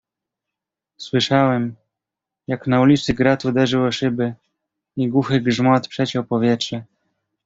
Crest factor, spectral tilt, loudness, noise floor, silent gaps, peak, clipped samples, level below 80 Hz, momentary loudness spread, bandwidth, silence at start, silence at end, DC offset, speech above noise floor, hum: 18 dB; -6 dB/octave; -19 LUFS; -85 dBFS; none; -2 dBFS; under 0.1%; -52 dBFS; 12 LU; 7.8 kHz; 1 s; 0.6 s; under 0.1%; 67 dB; none